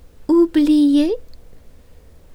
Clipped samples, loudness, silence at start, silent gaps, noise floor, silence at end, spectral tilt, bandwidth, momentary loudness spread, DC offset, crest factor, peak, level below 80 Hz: under 0.1%; -15 LUFS; 0.2 s; none; -43 dBFS; 0.75 s; -5.5 dB/octave; 11 kHz; 8 LU; under 0.1%; 12 dB; -6 dBFS; -42 dBFS